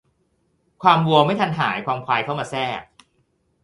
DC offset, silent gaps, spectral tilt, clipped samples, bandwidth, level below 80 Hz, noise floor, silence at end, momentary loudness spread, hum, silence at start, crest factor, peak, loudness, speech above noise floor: under 0.1%; none; -6 dB/octave; under 0.1%; 11.5 kHz; -60 dBFS; -67 dBFS; 0.8 s; 10 LU; none; 0.8 s; 22 dB; 0 dBFS; -20 LUFS; 47 dB